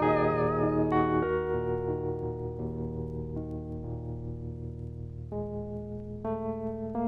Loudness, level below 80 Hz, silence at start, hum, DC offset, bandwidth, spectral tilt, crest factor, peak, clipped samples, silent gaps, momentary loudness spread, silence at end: -32 LUFS; -46 dBFS; 0 s; none; under 0.1%; 5.2 kHz; -10.5 dB/octave; 16 dB; -14 dBFS; under 0.1%; none; 13 LU; 0 s